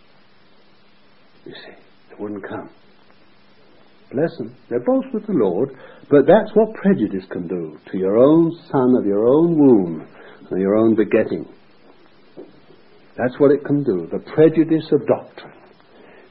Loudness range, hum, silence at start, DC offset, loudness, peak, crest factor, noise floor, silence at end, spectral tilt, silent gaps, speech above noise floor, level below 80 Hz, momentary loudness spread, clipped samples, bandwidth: 14 LU; none; 1.45 s; 0.3%; -18 LUFS; -2 dBFS; 18 dB; -54 dBFS; 0.85 s; -12.5 dB/octave; none; 37 dB; -60 dBFS; 18 LU; under 0.1%; 5 kHz